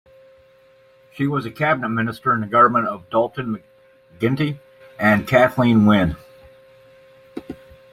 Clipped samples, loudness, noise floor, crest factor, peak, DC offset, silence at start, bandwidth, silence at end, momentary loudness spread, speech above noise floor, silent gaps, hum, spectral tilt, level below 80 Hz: under 0.1%; -19 LUFS; -52 dBFS; 18 dB; -2 dBFS; under 0.1%; 1.15 s; 15 kHz; 0.4 s; 21 LU; 34 dB; none; none; -7.5 dB/octave; -50 dBFS